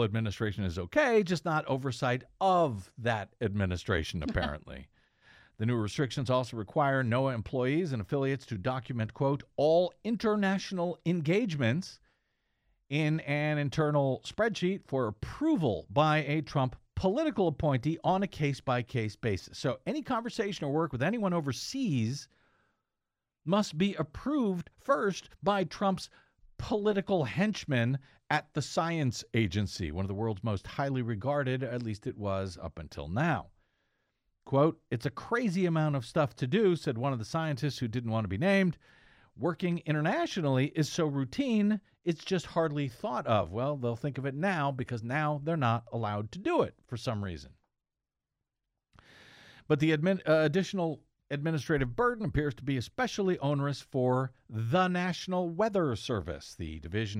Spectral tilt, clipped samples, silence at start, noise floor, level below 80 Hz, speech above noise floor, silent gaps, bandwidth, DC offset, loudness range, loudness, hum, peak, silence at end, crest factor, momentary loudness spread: -6.5 dB/octave; under 0.1%; 0 s; -90 dBFS; -56 dBFS; 59 dB; none; 14 kHz; under 0.1%; 4 LU; -31 LUFS; none; -12 dBFS; 0 s; 18 dB; 8 LU